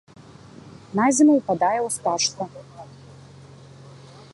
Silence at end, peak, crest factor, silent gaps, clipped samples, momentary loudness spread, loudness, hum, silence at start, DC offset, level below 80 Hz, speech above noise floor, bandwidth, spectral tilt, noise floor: 0.45 s; -6 dBFS; 18 dB; none; under 0.1%; 26 LU; -20 LUFS; none; 0.65 s; under 0.1%; -62 dBFS; 25 dB; 11.5 kHz; -3.5 dB/octave; -45 dBFS